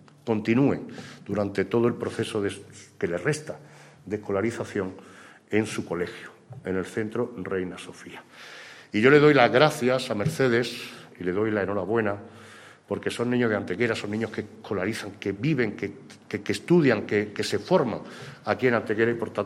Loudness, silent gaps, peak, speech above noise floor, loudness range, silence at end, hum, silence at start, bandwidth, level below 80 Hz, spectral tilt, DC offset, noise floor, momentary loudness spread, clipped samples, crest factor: -26 LUFS; none; -2 dBFS; 23 dB; 9 LU; 0 s; none; 0.25 s; 14.5 kHz; -66 dBFS; -6 dB/octave; under 0.1%; -48 dBFS; 19 LU; under 0.1%; 24 dB